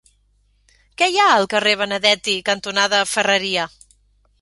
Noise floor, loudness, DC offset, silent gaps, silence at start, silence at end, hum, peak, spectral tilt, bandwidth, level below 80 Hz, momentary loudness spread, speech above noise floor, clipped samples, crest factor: -60 dBFS; -17 LUFS; under 0.1%; none; 1 s; 0.75 s; 50 Hz at -50 dBFS; -2 dBFS; -1.5 dB/octave; 11.5 kHz; -58 dBFS; 6 LU; 42 dB; under 0.1%; 18 dB